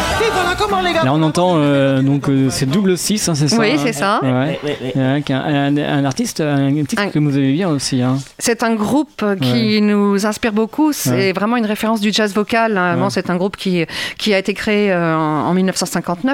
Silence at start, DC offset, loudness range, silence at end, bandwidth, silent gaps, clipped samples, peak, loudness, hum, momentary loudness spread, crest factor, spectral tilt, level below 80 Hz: 0 s; under 0.1%; 2 LU; 0 s; 16.5 kHz; none; under 0.1%; -2 dBFS; -16 LUFS; none; 5 LU; 12 dB; -5 dB/octave; -44 dBFS